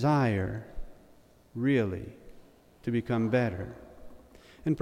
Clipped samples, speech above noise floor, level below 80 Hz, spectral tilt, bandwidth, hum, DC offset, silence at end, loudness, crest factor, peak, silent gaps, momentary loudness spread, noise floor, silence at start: under 0.1%; 30 dB; -52 dBFS; -8.5 dB/octave; 13.5 kHz; none; under 0.1%; 0 s; -30 LUFS; 18 dB; -14 dBFS; none; 20 LU; -58 dBFS; 0 s